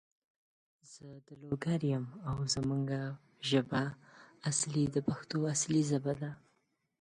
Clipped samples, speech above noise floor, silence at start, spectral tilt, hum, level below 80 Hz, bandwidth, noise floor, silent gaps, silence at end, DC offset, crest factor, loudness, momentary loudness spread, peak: under 0.1%; 43 dB; 0.9 s; -5 dB/octave; none; -64 dBFS; 11.5 kHz; -78 dBFS; none; 0.65 s; under 0.1%; 20 dB; -34 LUFS; 21 LU; -16 dBFS